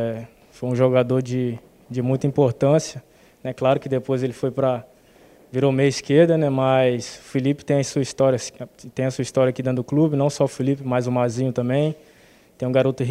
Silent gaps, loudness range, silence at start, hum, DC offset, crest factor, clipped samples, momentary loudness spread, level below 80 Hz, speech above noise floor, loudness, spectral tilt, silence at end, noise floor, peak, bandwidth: none; 3 LU; 0 s; none; under 0.1%; 18 dB; under 0.1%; 12 LU; -58 dBFS; 32 dB; -21 LUFS; -6.5 dB/octave; 0 s; -52 dBFS; -2 dBFS; 12.5 kHz